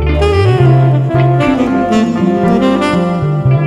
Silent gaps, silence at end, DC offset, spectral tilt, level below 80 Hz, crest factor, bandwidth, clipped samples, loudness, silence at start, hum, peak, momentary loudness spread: none; 0 s; under 0.1%; -8 dB/octave; -24 dBFS; 10 dB; 10.5 kHz; under 0.1%; -11 LUFS; 0 s; none; -2 dBFS; 4 LU